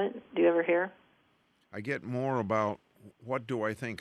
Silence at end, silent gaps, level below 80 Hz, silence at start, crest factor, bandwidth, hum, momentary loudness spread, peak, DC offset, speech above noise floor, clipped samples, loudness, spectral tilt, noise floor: 0.05 s; none; -74 dBFS; 0 s; 18 dB; 11.5 kHz; none; 15 LU; -14 dBFS; under 0.1%; 39 dB; under 0.1%; -31 LUFS; -7 dB/octave; -70 dBFS